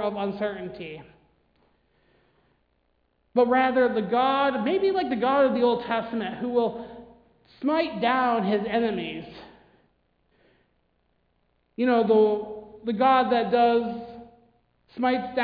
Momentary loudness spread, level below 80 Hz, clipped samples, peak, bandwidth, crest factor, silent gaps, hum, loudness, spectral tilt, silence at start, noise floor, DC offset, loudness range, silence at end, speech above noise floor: 16 LU; -62 dBFS; under 0.1%; -8 dBFS; 5 kHz; 18 dB; none; none; -24 LUFS; -8.5 dB/octave; 0 s; -70 dBFS; under 0.1%; 8 LU; 0 s; 46 dB